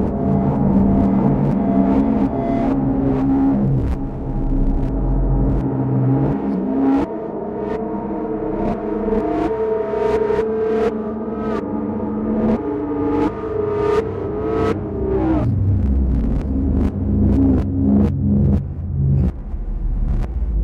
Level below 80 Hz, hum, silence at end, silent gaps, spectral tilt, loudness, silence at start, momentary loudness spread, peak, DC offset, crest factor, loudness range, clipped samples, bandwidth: -26 dBFS; none; 0 s; none; -10.5 dB/octave; -19 LUFS; 0 s; 8 LU; -2 dBFS; under 0.1%; 16 dB; 4 LU; under 0.1%; 6.6 kHz